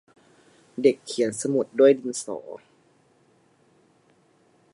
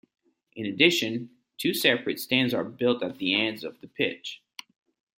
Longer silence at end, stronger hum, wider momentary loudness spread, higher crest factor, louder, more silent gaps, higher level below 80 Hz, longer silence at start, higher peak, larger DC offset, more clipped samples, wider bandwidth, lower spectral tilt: first, 2.15 s vs 0.85 s; neither; first, 21 LU vs 18 LU; about the same, 22 dB vs 24 dB; about the same, -23 LUFS vs -25 LUFS; neither; second, -78 dBFS vs -72 dBFS; first, 0.8 s vs 0.55 s; about the same, -6 dBFS vs -4 dBFS; neither; neither; second, 11.5 kHz vs 16.5 kHz; about the same, -4.5 dB/octave vs -4 dB/octave